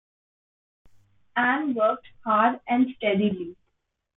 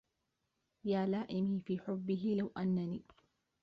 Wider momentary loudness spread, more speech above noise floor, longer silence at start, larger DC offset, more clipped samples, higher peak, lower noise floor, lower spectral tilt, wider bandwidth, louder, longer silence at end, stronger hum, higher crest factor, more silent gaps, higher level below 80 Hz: first, 10 LU vs 6 LU; first, 53 dB vs 48 dB; first, 1.35 s vs 0.85 s; neither; neither; first, -8 dBFS vs -24 dBFS; second, -77 dBFS vs -85 dBFS; first, -9.5 dB/octave vs -7.5 dB/octave; second, 4 kHz vs 5.4 kHz; first, -24 LUFS vs -37 LUFS; about the same, 0.65 s vs 0.6 s; neither; about the same, 18 dB vs 14 dB; neither; first, -68 dBFS vs -74 dBFS